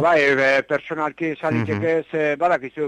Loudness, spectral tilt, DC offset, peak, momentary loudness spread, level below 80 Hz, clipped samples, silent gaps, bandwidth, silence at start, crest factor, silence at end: -20 LUFS; -6 dB/octave; under 0.1%; -8 dBFS; 9 LU; -60 dBFS; under 0.1%; none; 10.5 kHz; 0 s; 12 dB; 0 s